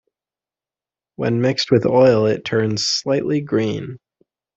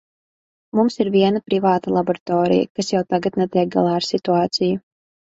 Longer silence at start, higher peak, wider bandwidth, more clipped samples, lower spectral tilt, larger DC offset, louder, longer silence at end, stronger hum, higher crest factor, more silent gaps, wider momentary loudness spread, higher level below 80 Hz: first, 1.2 s vs 0.75 s; about the same, -2 dBFS vs -2 dBFS; about the same, 8 kHz vs 8 kHz; neither; about the same, -5.5 dB/octave vs -6 dB/octave; neither; about the same, -18 LUFS vs -19 LUFS; about the same, 0.6 s vs 0.5 s; neither; about the same, 18 dB vs 16 dB; second, none vs 2.21-2.26 s, 2.70-2.75 s; first, 11 LU vs 4 LU; about the same, -56 dBFS vs -60 dBFS